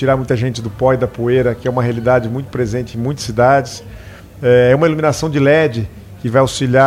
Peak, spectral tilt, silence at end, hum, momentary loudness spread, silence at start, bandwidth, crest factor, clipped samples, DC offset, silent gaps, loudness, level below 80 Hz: 0 dBFS; -6.5 dB/octave; 0 s; none; 10 LU; 0 s; 15 kHz; 14 dB; under 0.1%; under 0.1%; none; -15 LUFS; -38 dBFS